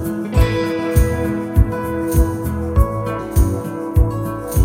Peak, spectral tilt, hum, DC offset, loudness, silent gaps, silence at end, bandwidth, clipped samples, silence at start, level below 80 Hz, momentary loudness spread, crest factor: 0 dBFS; -7 dB/octave; none; under 0.1%; -19 LUFS; none; 0 s; 16.5 kHz; under 0.1%; 0 s; -20 dBFS; 5 LU; 16 dB